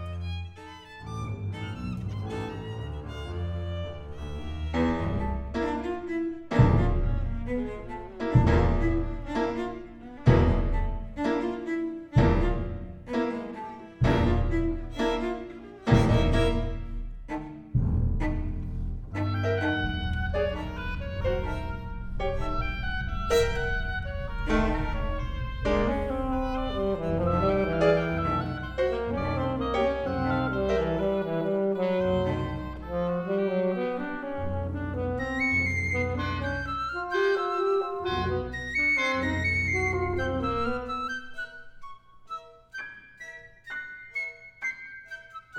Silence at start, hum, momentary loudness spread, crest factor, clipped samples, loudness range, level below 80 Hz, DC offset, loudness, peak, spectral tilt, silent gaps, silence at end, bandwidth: 0 s; none; 14 LU; 22 dB; under 0.1%; 7 LU; -34 dBFS; under 0.1%; -28 LUFS; -6 dBFS; -7 dB/octave; none; 0 s; 9.6 kHz